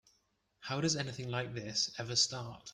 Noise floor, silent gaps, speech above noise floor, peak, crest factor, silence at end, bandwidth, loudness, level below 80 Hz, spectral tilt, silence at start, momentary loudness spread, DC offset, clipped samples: -77 dBFS; none; 40 dB; -18 dBFS; 20 dB; 0 s; 12 kHz; -34 LUFS; -68 dBFS; -3 dB/octave; 0.6 s; 10 LU; under 0.1%; under 0.1%